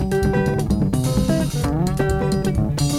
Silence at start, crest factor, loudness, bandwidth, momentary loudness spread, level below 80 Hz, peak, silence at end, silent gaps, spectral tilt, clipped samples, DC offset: 0 s; 12 dB; -20 LUFS; 15.5 kHz; 2 LU; -28 dBFS; -6 dBFS; 0 s; none; -6.5 dB/octave; under 0.1%; under 0.1%